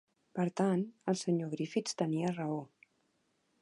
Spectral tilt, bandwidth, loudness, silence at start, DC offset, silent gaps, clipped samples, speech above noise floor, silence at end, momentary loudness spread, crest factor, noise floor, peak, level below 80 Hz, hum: -6 dB/octave; 11.5 kHz; -35 LUFS; 0.35 s; under 0.1%; none; under 0.1%; 43 dB; 0.95 s; 6 LU; 18 dB; -77 dBFS; -18 dBFS; -82 dBFS; none